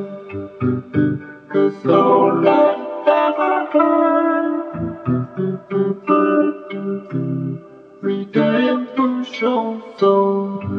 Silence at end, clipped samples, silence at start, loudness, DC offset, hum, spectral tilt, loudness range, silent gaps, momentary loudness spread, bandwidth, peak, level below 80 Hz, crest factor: 0 s; under 0.1%; 0 s; -18 LUFS; under 0.1%; none; -9 dB/octave; 5 LU; none; 12 LU; 6.6 kHz; -2 dBFS; -58 dBFS; 16 dB